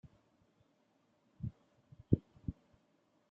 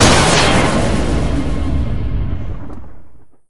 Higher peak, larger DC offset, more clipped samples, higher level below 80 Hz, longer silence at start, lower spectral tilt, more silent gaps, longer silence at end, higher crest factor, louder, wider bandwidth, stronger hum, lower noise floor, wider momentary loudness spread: second, -14 dBFS vs 0 dBFS; second, under 0.1% vs 9%; neither; second, -62 dBFS vs -22 dBFS; first, 1.4 s vs 0 s; first, -13 dB/octave vs -4 dB/octave; neither; first, 0.8 s vs 0 s; first, 30 dB vs 16 dB; second, -41 LUFS vs -15 LUFS; second, 3.7 kHz vs 12 kHz; neither; first, -75 dBFS vs -37 dBFS; second, 12 LU vs 19 LU